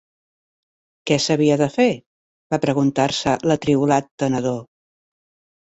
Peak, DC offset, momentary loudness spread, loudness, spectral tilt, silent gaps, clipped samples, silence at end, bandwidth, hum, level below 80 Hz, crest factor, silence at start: -4 dBFS; under 0.1%; 9 LU; -19 LUFS; -5.5 dB/octave; 2.06-2.50 s, 4.11-4.18 s; under 0.1%; 1.1 s; 8.2 kHz; none; -56 dBFS; 16 dB; 1.05 s